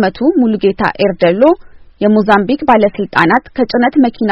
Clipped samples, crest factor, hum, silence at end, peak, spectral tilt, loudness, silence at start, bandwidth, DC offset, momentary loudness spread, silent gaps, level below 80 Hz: 0.2%; 12 dB; none; 0 s; 0 dBFS; -8 dB/octave; -12 LUFS; 0 s; 7 kHz; 0.1%; 4 LU; none; -42 dBFS